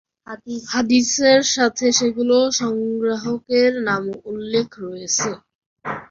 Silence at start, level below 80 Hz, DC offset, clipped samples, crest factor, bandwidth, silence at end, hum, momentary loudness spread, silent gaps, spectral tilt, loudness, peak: 0.3 s; -60 dBFS; under 0.1%; under 0.1%; 18 dB; 7.6 kHz; 0.05 s; none; 16 LU; 5.55-5.76 s; -2.5 dB/octave; -18 LUFS; -2 dBFS